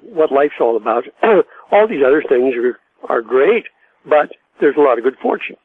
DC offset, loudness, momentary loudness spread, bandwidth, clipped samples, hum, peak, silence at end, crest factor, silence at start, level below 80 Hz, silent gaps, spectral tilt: under 0.1%; -15 LUFS; 7 LU; 4 kHz; under 0.1%; none; 0 dBFS; 0.1 s; 14 dB; 0.05 s; -64 dBFS; none; -7.5 dB/octave